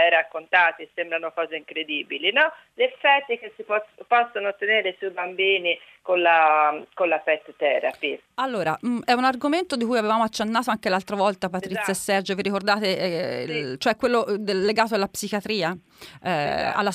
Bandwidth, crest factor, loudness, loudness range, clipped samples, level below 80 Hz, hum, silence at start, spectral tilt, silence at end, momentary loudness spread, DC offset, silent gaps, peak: 15.5 kHz; 18 dB; -23 LUFS; 3 LU; under 0.1%; -64 dBFS; none; 0 s; -4 dB/octave; 0 s; 9 LU; under 0.1%; none; -4 dBFS